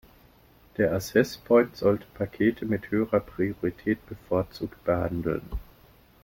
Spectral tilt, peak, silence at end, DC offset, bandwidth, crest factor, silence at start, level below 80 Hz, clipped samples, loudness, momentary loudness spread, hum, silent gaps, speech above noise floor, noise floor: -7 dB/octave; -8 dBFS; 0.6 s; under 0.1%; 17 kHz; 20 dB; 0.8 s; -48 dBFS; under 0.1%; -27 LUFS; 11 LU; none; none; 31 dB; -57 dBFS